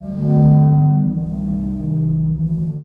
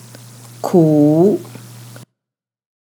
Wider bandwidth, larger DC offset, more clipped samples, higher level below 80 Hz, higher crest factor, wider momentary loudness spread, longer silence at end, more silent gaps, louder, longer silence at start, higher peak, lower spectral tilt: second, 1.6 kHz vs 20 kHz; neither; neither; first, -34 dBFS vs -80 dBFS; about the same, 12 dB vs 16 dB; second, 10 LU vs 24 LU; second, 0 s vs 0.9 s; neither; second, -16 LUFS vs -13 LUFS; second, 0 s vs 0.65 s; second, -4 dBFS vs 0 dBFS; first, -13 dB/octave vs -8.5 dB/octave